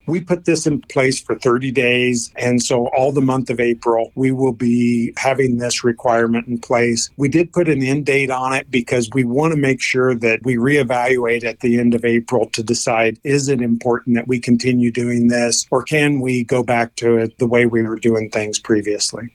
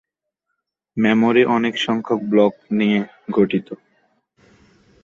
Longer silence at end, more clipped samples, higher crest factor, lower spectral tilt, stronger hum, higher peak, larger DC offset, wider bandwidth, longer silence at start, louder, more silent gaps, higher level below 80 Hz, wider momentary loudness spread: second, 0.05 s vs 1.3 s; neither; about the same, 14 dB vs 18 dB; second, -5 dB/octave vs -6.5 dB/octave; neither; about the same, -2 dBFS vs -2 dBFS; neither; first, 14 kHz vs 7.4 kHz; second, 0.05 s vs 0.95 s; about the same, -17 LUFS vs -18 LUFS; neither; first, -52 dBFS vs -62 dBFS; second, 3 LU vs 10 LU